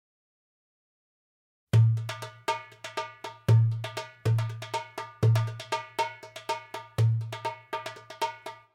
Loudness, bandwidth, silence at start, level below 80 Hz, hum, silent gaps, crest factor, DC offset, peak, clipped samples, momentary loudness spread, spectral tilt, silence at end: -30 LUFS; 14 kHz; 1.75 s; -60 dBFS; none; none; 18 dB; under 0.1%; -12 dBFS; under 0.1%; 14 LU; -6 dB/octave; 0.2 s